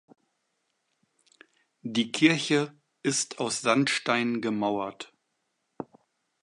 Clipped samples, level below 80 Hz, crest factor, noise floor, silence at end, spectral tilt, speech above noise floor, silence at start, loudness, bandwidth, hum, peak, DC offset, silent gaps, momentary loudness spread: under 0.1%; -76 dBFS; 24 dB; -78 dBFS; 0.6 s; -3.5 dB/octave; 51 dB; 1.85 s; -27 LUFS; 11.5 kHz; none; -6 dBFS; under 0.1%; none; 21 LU